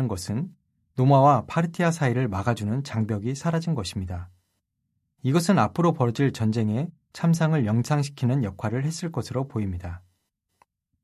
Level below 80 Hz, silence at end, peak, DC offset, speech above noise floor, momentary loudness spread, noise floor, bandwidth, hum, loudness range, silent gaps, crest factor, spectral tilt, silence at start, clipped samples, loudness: -48 dBFS; 1.05 s; -6 dBFS; under 0.1%; 53 dB; 11 LU; -77 dBFS; 13.5 kHz; none; 5 LU; none; 18 dB; -7 dB/octave; 0 s; under 0.1%; -25 LUFS